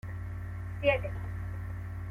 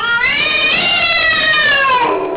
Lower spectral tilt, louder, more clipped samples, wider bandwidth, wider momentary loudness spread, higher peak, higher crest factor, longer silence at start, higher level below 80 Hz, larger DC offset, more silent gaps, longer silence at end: first, -7.5 dB/octave vs -5.5 dB/octave; second, -34 LUFS vs -10 LUFS; neither; first, 5.2 kHz vs 4 kHz; first, 11 LU vs 3 LU; second, -14 dBFS vs -4 dBFS; first, 20 dB vs 8 dB; about the same, 0.05 s vs 0 s; about the same, -46 dBFS vs -44 dBFS; second, under 0.1% vs 0.2%; neither; about the same, 0 s vs 0 s